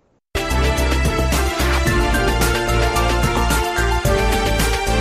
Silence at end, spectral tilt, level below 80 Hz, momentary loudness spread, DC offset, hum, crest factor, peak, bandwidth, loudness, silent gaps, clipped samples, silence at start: 0 s; -4.5 dB/octave; -20 dBFS; 2 LU; under 0.1%; none; 12 dB; -4 dBFS; 15.5 kHz; -18 LUFS; none; under 0.1%; 0.35 s